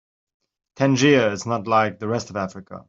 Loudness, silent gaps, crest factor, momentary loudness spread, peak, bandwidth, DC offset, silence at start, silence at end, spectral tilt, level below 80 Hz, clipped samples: -20 LUFS; none; 20 dB; 13 LU; -2 dBFS; 7.8 kHz; under 0.1%; 0.8 s; 0.05 s; -5.5 dB/octave; -62 dBFS; under 0.1%